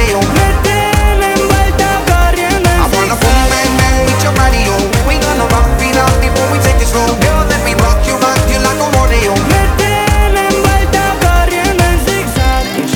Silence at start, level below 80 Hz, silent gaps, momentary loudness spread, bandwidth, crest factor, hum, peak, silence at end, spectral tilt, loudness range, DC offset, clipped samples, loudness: 0 s; -14 dBFS; none; 2 LU; 19 kHz; 10 dB; none; 0 dBFS; 0 s; -4.5 dB/octave; 1 LU; under 0.1%; under 0.1%; -11 LUFS